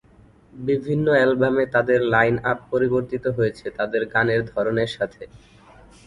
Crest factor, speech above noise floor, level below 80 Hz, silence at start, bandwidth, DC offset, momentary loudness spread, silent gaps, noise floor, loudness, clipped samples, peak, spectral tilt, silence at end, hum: 18 dB; 31 dB; -52 dBFS; 0.55 s; 11 kHz; under 0.1%; 8 LU; none; -52 dBFS; -21 LUFS; under 0.1%; -4 dBFS; -7.5 dB/octave; 0.7 s; none